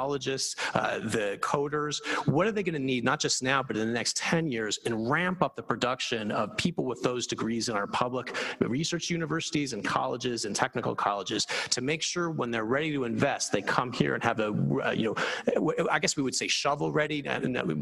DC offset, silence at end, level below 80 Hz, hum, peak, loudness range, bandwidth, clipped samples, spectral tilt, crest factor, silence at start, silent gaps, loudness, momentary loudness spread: under 0.1%; 0 s; -62 dBFS; none; -6 dBFS; 2 LU; 12.5 kHz; under 0.1%; -4 dB/octave; 22 dB; 0 s; none; -29 LUFS; 4 LU